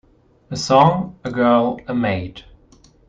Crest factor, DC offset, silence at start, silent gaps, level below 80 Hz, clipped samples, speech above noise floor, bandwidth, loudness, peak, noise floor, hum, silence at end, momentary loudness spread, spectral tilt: 18 dB; under 0.1%; 0.5 s; none; -50 dBFS; under 0.1%; 34 dB; 9.2 kHz; -18 LUFS; 0 dBFS; -51 dBFS; none; 0.65 s; 13 LU; -6 dB/octave